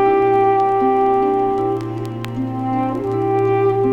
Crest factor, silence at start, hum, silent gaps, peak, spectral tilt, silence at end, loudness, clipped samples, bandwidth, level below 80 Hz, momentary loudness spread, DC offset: 12 dB; 0 s; none; none; -4 dBFS; -8.5 dB/octave; 0 s; -18 LUFS; under 0.1%; 6.6 kHz; -46 dBFS; 10 LU; under 0.1%